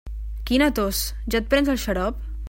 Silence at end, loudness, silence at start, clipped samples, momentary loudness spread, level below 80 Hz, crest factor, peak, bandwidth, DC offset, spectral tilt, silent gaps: 0 s; -23 LUFS; 0.05 s; under 0.1%; 8 LU; -32 dBFS; 18 dB; -4 dBFS; 16.5 kHz; under 0.1%; -4.5 dB/octave; none